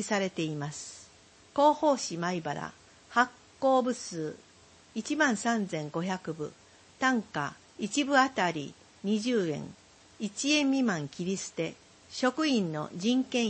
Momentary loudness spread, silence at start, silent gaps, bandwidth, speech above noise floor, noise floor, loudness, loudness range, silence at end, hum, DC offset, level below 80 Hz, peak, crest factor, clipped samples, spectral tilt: 14 LU; 0 s; none; 8.8 kHz; 28 dB; -58 dBFS; -30 LUFS; 2 LU; 0 s; none; under 0.1%; -72 dBFS; -10 dBFS; 22 dB; under 0.1%; -4 dB/octave